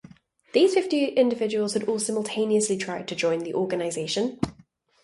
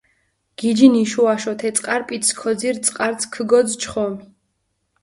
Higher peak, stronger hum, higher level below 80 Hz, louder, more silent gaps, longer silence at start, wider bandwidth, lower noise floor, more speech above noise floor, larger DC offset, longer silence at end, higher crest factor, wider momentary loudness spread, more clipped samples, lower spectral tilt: second, -6 dBFS vs 0 dBFS; neither; about the same, -60 dBFS vs -58 dBFS; second, -25 LUFS vs -18 LUFS; neither; about the same, 0.55 s vs 0.6 s; about the same, 11.5 kHz vs 11.5 kHz; second, -58 dBFS vs -71 dBFS; second, 33 dB vs 53 dB; neither; second, 0.5 s vs 0.8 s; about the same, 18 dB vs 18 dB; second, 8 LU vs 11 LU; neither; about the same, -4 dB/octave vs -3.5 dB/octave